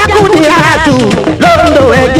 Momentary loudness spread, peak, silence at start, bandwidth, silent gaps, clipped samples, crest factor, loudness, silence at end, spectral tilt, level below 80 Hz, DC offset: 3 LU; 0 dBFS; 0 s; 19 kHz; none; 3%; 6 dB; -6 LUFS; 0 s; -5 dB/octave; -28 dBFS; under 0.1%